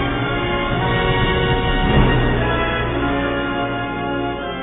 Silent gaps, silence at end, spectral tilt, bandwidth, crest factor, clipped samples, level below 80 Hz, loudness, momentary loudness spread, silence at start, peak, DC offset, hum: none; 0 s; -10 dB/octave; 4 kHz; 16 dB; under 0.1%; -26 dBFS; -19 LUFS; 6 LU; 0 s; -2 dBFS; 0.2%; none